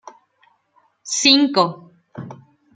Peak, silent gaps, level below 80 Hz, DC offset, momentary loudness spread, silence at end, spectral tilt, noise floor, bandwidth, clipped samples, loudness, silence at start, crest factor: -2 dBFS; none; -68 dBFS; under 0.1%; 25 LU; 0.4 s; -2.5 dB/octave; -61 dBFS; 9.4 kHz; under 0.1%; -16 LUFS; 1.05 s; 20 dB